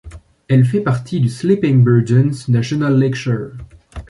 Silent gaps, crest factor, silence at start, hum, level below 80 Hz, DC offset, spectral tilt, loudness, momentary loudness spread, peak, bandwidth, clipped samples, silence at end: none; 14 dB; 0.05 s; none; -42 dBFS; under 0.1%; -8 dB/octave; -15 LUFS; 9 LU; -2 dBFS; 11 kHz; under 0.1%; 0.05 s